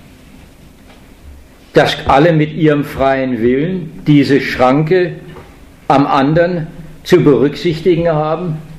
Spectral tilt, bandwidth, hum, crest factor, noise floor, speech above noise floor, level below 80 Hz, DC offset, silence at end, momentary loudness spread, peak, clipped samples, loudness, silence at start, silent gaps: -7 dB/octave; 14 kHz; none; 14 dB; -39 dBFS; 28 dB; -38 dBFS; under 0.1%; 0 s; 10 LU; 0 dBFS; 0.1%; -12 LUFS; 1.25 s; none